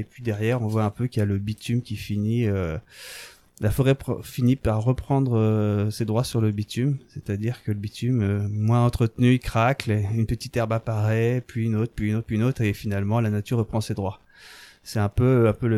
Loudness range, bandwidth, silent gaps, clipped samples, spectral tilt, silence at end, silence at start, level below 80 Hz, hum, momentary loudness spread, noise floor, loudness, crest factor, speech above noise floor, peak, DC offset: 3 LU; 14 kHz; none; under 0.1%; -7.5 dB/octave; 0 s; 0 s; -44 dBFS; none; 9 LU; -48 dBFS; -24 LUFS; 18 dB; 24 dB; -6 dBFS; under 0.1%